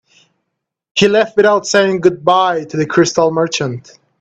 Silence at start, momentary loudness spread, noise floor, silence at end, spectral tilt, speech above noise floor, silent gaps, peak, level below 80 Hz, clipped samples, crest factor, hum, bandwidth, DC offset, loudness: 0.95 s; 8 LU; -75 dBFS; 0.4 s; -4.5 dB/octave; 62 dB; none; 0 dBFS; -56 dBFS; under 0.1%; 14 dB; none; 8.6 kHz; under 0.1%; -13 LUFS